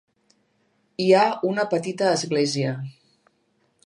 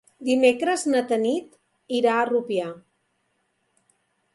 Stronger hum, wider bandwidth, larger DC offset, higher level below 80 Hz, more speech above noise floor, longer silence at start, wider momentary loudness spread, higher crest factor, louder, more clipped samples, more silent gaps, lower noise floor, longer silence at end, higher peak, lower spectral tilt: neither; about the same, 11.5 kHz vs 11.5 kHz; neither; about the same, -74 dBFS vs -74 dBFS; second, 46 dB vs 50 dB; first, 1 s vs 0.2 s; first, 15 LU vs 9 LU; about the same, 20 dB vs 20 dB; about the same, -22 LUFS vs -23 LUFS; neither; neither; second, -68 dBFS vs -72 dBFS; second, 0.95 s vs 1.55 s; about the same, -4 dBFS vs -6 dBFS; first, -5 dB/octave vs -3.5 dB/octave